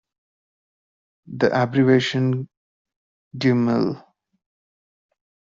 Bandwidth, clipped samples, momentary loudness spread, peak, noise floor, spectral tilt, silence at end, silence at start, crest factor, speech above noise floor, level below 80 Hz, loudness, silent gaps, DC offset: 7.6 kHz; under 0.1%; 21 LU; -4 dBFS; under -90 dBFS; -5.5 dB/octave; 1.5 s; 1.3 s; 20 dB; over 71 dB; -64 dBFS; -20 LUFS; 2.57-2.85 s, 2.96-3.31 s; under 0.1%